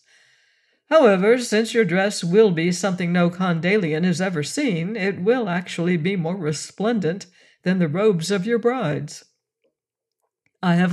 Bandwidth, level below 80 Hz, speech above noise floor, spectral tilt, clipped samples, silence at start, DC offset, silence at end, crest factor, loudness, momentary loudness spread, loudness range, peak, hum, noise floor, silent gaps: 12.5 kHz; -72 dBFS; 64 dB; -6 dB/octave; under 0.1%; 0.9 s; under 0.1%; 0 s; 18 dB; -20 LUFS; 9 LU; 5 LU; -4 dBFS; none; -84 dBFS; none